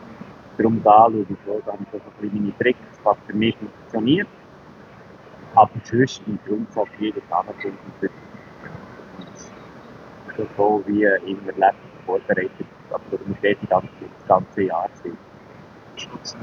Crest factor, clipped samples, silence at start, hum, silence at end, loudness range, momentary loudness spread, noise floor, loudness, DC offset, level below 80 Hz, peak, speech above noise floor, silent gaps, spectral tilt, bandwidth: 22 dB; under 0.1%; 0 s; none; 0 s; 9 LU; 22 LU; -44 dBFS; -21 LUFS; under 0.1%; -62 dBFS; 0 dBFS; 23 dB; none; -6.5 dB/octave; 7.2 kHz